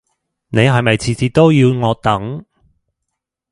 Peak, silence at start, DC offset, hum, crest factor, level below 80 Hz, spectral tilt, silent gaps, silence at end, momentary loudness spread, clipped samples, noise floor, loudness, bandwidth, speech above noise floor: 0 dBFS; 0.5 s; under 0.1%; none; 16 dB; -44 dBFS; -6.5 dB/octave; none; 1.1 s; 10 LU; under 0.1%; -77 dBFS; -14 LUFS; 11.5 kHz; 64 dB